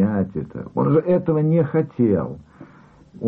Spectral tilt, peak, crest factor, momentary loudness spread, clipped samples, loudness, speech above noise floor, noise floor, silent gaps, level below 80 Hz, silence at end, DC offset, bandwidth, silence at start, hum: -12.5 dB/octave; -8 dBFS; 12 dB; 11 LU; under 0.1%; -20 LUFS; 29 dB; -48 dBFS; none; -52 dBFS; 0 s; under 0.1%; 4 kHz; 0 s; none